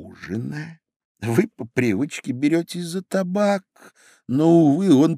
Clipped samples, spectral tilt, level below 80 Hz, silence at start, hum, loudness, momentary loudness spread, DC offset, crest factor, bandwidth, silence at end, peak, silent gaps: under 0.1%; -7 dB/octave; -66 dBFS; 0 s; none; -21 LUFS; 15 LU; under 0.1%; 18 dB; 15 kHz; 0 s; -2 dBFS; 0.96-1.15 s